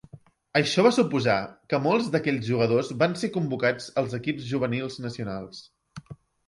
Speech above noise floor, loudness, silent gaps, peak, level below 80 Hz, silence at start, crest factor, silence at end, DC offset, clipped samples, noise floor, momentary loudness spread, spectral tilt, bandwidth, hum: 25 dB; -25 LUFS; none; -8 dBFS; -62 dBFS; 0.15 s; 18 dB; 0.35 s; under 0.1%; under 0.1%; -50 dBFS; 13 LU; -6 dB/octave; 11.5 kHz; none